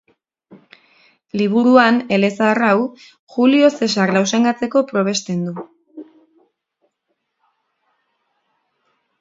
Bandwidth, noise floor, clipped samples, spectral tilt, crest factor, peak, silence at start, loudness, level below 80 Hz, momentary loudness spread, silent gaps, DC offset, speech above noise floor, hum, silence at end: 7.8 kHz; -73 dBFS; under 0.1%; -5 dB/octave; 18 dB; 0 dBFS; 0.5 s; -16 LUFS; -66 dBFS; 14 LU; 3.19-3.27 s; under 0.1%; 57 dB; none; 3.15 s